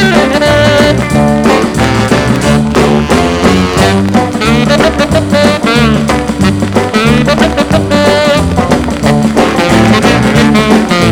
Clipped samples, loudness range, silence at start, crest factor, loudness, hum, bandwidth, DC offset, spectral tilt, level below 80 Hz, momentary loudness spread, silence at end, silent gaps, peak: 2%; 1 LU; 0 s; 8 dB; -8 LUFS; none; 17.5 kHz; under 0.1%; -5.5 dB/octave; -24 dBFS; 4 LU; 0 s; none; 0 dBFS